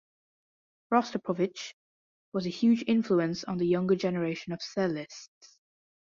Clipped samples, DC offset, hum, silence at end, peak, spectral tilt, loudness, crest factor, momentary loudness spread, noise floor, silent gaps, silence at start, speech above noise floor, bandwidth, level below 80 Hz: under 0.1%; under 0.1%; none; 0.85 s; -10 dBFS; -6.5 dB/octave; -29 LUFS; 20 dB; 12 LU; under -90 dBFS; 1.73-2.32 s; 0.9 s; over 61 dB; 7.4 kHz; -70 dBFS